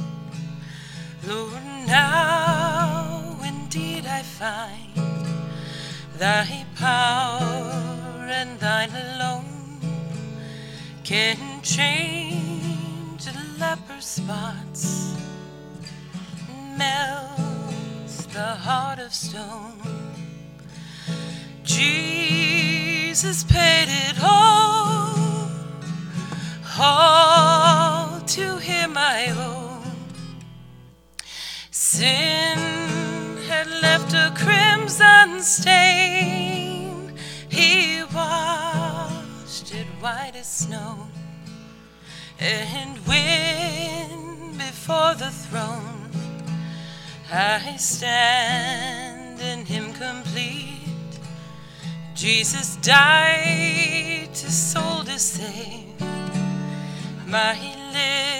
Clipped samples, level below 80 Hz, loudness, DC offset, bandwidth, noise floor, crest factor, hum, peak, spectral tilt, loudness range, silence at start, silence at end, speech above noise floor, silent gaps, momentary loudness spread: under 0.1%; -48 dBFS; -20 LUFS; under 0.1%; 16.5 kHz; -47 dBFS; 22 dB; none; 0 dBFS; -3 dB/octave; 13 LU; 0 s; 0 s; 27 dB; none; 21 LU